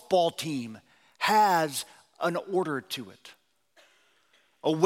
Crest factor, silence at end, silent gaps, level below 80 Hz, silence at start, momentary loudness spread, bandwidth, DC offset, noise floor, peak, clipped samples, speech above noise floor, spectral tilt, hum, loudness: 22 dB; 0 s; none; -82 dBFS; 0.1 s; 15 LU; 16.5 kHz; under 0.1%; -66 dBFS; -6 dBFS; under 0.1%; 39 dB; -4 dB/octave; none; -28 LUFS